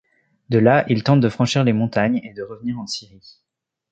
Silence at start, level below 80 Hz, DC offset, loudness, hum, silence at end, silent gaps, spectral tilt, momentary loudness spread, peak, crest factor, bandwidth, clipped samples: 0.5 s; -56 dBFS; under 0.1%; -19 LUFS; none; 0.9 s; none; -6.5 dB/octave; 14 LU; -2 dBFS; 18 dB; 8.8 kHz; under 0.1%